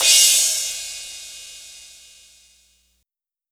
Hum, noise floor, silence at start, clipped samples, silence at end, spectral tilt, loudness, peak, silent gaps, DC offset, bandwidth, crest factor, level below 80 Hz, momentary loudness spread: none; -80 dBFS; 0 s; under 0.1%; 1.75 s; 4.5 dB/octave; -15 LUFS; 0 dBFS; none; under 0.1%; over 20 kHz; 22 dB; -60 dBFS; 26 LU